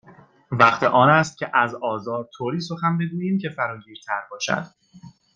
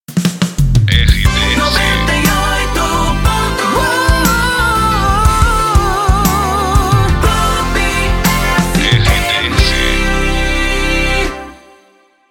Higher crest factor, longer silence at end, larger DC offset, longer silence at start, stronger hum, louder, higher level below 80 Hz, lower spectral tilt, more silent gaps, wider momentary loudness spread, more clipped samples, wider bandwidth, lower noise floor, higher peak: first, 20 dB vs 12 dB; second, 0.25 s vs 0.75 s; neither; about the same, 0.1 s vs 0.1 s; neither; second, -21 LUFS vs -12 LUFS; second, -64 dBFS vs -16 dBFS; about the same, -5.5 dB/octave vs -4.5 dB/octave; neither; first, 14 LU vs 3 LU; neither; second, 9 kHz vs 17.5 kHz; about the same, -50 dBFS vs -50 dBFS; about the same, -2 dBFS vs 0 dBFS